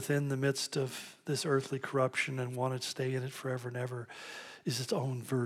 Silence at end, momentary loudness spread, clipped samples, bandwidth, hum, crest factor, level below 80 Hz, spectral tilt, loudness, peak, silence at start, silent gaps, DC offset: 0 s; 9 LU; under 0.1%; 15.5 kHz; none; 18 dB; -86 dBFS; -5 dB/octave; -35 LUFS; -18 dBFS; 0 s; none; under 0.1%